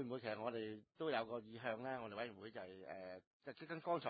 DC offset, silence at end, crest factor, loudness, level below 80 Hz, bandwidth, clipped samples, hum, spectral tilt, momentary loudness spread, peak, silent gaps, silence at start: under 0.1%; 0 s; 20 dB; -48 LUFS; -84 dBFS; 4.8 kHz; under 0.1%; none; -3.5 dB/octave; 11 LU; -26 dBFS; 3.27-3.40 s; 0 s